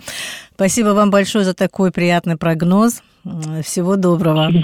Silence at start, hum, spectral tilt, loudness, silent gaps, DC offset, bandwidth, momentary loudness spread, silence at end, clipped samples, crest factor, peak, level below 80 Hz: 0.05 s; none; -5.5 dB/octave; -16 LUFS; none; under 0.1%; 16.5 kHz; 12 LU; 0 s; under 0.1%; 12 dB; -2 dBFS; -50 dBFS